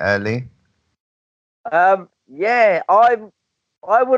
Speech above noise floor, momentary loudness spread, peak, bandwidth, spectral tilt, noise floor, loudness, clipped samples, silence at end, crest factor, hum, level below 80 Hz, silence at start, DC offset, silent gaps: over 75 dB; 11 LU; -4 dBFS; 7.4 kHz; -6.5 dB/octave; under -90 dBFS; -16 LUFS; under 0.1%; 0 s; 14 dB; none; -64 dBFS; 0 s; under 0.1%; 1.00-1.64 s